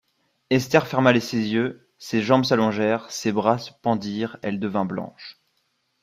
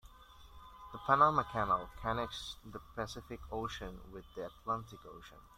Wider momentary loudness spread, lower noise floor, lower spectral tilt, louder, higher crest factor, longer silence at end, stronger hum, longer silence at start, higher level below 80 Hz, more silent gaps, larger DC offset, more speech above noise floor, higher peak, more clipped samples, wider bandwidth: second, 10 LU vs 24 LU; first, -71 dBFS vs -57 dBFS; about the same, -5.5 dB/octave vs -5 dB/octave; first, -23 LUFS vs -36 LUFS; about the same, 20 dB vs 24 dB; first, 0.7 s vs 0.1 s; neither; first, 0.5 s vs 0.05 s; second, -62 dBFS vs -56 dBFS; neither; neither; first, 49 dB vs 20 dB; first, -2 dBFS vs -14 dBFS; neither; about the same, 15.5 kHz vs 15 kHz